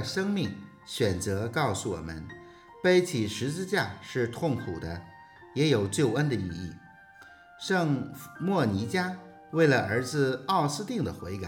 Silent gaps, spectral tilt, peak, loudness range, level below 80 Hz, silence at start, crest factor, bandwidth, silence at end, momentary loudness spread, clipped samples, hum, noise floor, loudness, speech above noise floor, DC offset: none; -5.5 dB/octave; -12 dBFS; 3 LU; -62 dBFS; 0 s; 18 dB; 19 kHz; 0 s; 15 LU; under 0.1%; none; -52 dBFS; -29 LUFS; 24 dB; under 0.1%